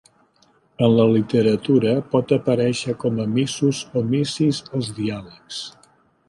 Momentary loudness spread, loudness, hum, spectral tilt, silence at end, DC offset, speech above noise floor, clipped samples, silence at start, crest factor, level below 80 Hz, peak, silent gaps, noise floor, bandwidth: 14 LU; -20 LUFS; none; -6.5 dB/octave; 0.6 s; under 0.1%; 39 dB; under 0.1%; 0.8 s; 16 dB; -58 dBFS; -4 dBFS; none; -59 dBFS; 11.5 kHz